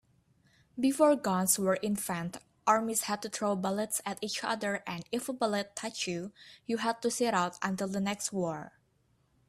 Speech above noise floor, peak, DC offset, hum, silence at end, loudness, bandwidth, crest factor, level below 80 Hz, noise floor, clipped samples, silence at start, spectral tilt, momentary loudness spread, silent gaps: 40 dB; -12 dBFS; under 0.1%; none; 0.8 s; -31 LUFS; 15.5 kHz; 20 dB; -72 dBFS; -71 dBFS; under 0.1%; 0.75 s; -4 dB/octave; 10 LU; none